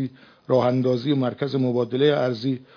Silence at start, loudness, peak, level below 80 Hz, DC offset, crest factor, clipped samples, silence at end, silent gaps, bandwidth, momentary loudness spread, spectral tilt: 0 s; -22 LUFS; -6 dBFS; -70 dBFS; under 0.1%; 16 dB; under 0.1%; 0.15 s; none; 5.4 kHz; 5 LU; -8.5 dB/octave